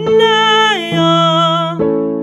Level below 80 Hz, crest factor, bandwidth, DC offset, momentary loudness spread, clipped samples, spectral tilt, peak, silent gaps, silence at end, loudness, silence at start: -52 dBFS; 12 dB; 12 kHz; under 0.1%; 6 LU; under 0.1%; -5 dB/octave; 0 dBFS; none; 0 s; -11 LUFS; 0 s